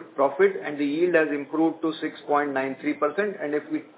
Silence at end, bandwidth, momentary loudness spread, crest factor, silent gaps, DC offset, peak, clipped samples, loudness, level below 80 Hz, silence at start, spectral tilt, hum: 0.1 s; 4 kHz; 7 LU; 18 dB; none; under 0.1%; -8 dBFS; under 0.1%; -25 LUFS; -80 dBFS; 0 s; -9.5 dB/octave; none